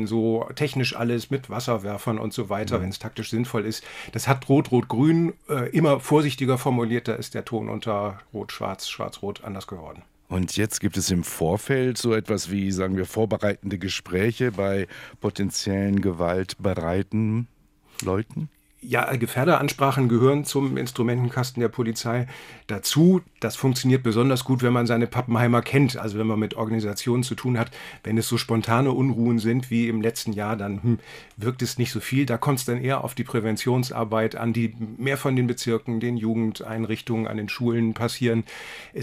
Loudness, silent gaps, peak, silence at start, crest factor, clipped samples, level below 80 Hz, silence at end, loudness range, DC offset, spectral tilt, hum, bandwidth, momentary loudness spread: -24 LUFS; none; -4 dBFS; 0 s; 20 dB; under 0.1%; -58 dBFS; 0 s; 5 LU; under 0.1%; -6 dB/octave; none; 16 kHz; 10 LU